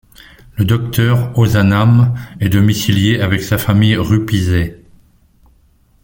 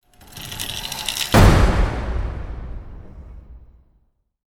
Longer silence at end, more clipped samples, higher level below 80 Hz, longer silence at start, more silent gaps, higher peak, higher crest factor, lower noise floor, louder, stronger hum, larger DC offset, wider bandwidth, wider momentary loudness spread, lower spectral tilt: first, 1.3 s vs 0.95 s; neither; second, -38 dBFS vs -24 dBFS; first, 0.55 s vs 0.35 s; neither; about the same, 0 dBFS vs 0 dBFS; second, 14 dB vs 20 dB; second, -52 dBFS vs -63 dBFS; first, -13 LUFS vs -19 LUFS; neither; neither; about the same, 17 kHz vs 18 kHz; second, 6 LU vs 27 LU; first, -6.5 dB/octave vs -5 dB/octave